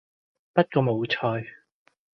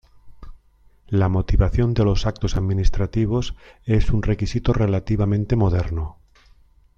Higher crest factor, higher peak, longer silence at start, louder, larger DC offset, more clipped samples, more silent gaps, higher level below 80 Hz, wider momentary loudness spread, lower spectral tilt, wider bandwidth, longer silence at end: first, 24 dB vs 16 dB; about the same, -4 dBFS vs -4 dBFS; first, 0.55 s vs 0.25 s; second, -25 LUFS vs -22 LUFS; neither; neither; neither; second, -66 dBFS vs -28 dBFS; first, 9 LU vs 6 LU; about the same, -8.5 dB/octave vs -8 dB/octave; second, 6.2 kHz vs 7.4 kHz; second, 0.65 s vs 0.85 s